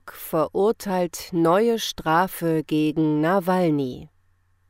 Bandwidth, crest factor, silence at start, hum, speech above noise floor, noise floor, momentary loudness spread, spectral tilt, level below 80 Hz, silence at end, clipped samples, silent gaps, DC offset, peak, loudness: 16 kHz; 16 dB; 0.05 s; none; 41 dB; -62 dBFS; 6 LU; -6 dB/octave; -54 dBFS; 0.65 s; under 0.1%; none; under 0.1%; -8 dBFS; -22 LUFS